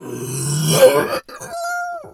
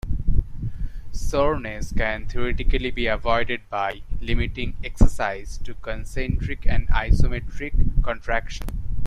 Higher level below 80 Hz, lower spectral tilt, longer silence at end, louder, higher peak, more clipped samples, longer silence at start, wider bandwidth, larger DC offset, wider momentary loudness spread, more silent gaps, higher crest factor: second, -56 dBFS vs -24 dBFS; second, -4 dB/octave vs -6 dB/octave; about the same, 0.05 s vs 0 s; first, -17 LUFS vs -26 LUFS; about the same, 0 dBFS vs -2 dBFS; neither; about the same, 0 s vs 0.05 s; first, 19.5 kHz vs 9.6 kHz; neither; first, 14 LU vs 11 LU; neither; about the same, 18 dB vs 18 dB